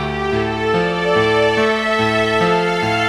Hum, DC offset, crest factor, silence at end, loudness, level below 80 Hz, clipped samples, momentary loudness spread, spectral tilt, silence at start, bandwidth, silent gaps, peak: none; under 0.1%; 12 dB; 0 s; -16 LUFS; -40 dBFS; under 0.1%; 4 LU; -5 dB/octave; 0 s; 12.5 kHz; none; -4 dBFS